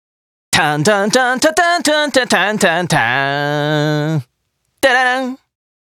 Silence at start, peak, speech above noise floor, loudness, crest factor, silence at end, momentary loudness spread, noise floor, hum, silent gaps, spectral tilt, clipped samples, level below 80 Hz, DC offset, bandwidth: 0.5 s; 0 dBFS; 53 dB; -14 LUFS; 14 dB; 0.55 s; 6 LU; -67 dBFS; none; none; -3.5 dB/octave; under 0.1%; -54 dBFS; under 0.1%; 17.5 kHz